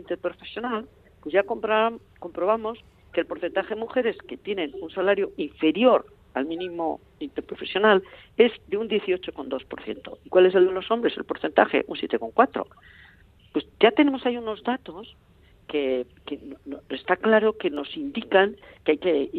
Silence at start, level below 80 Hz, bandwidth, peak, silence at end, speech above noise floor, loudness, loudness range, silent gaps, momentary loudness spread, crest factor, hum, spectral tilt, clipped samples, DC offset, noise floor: 0.1 s; -60 dBFS; 4.6 kHz; -2 dBFS; 0 s; 30 dB; -24 LUFS; 4 LU; none; 16 LU; 22 dB; none; -7.5 dB/octave; under 0.1%; under 0.1%; -54 dBFS